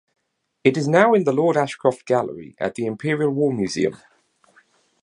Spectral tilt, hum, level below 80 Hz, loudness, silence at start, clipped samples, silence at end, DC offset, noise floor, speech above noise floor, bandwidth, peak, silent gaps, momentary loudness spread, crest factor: -6 dB/octave; none; -62 dBFS; -20 LUFS; 0.65 s; under 0.1%; 1.1 s; under 0.1%; -58 dBFS; 39 dB; 11 kHz; 0 dBFS; none; 9 LU; 20 dB